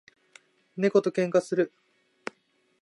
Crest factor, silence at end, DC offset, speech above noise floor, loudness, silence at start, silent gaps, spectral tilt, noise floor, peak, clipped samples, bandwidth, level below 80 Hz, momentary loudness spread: 20 dB; 1.15 s; under 0.1%; 43 dB; -26 LUFS; 0.75 s; none; -6.5 dB/octave; -68 dBFS; -8 dBFS; under 0.1%; 11.5 kHz; -80 dBFS; 18 LU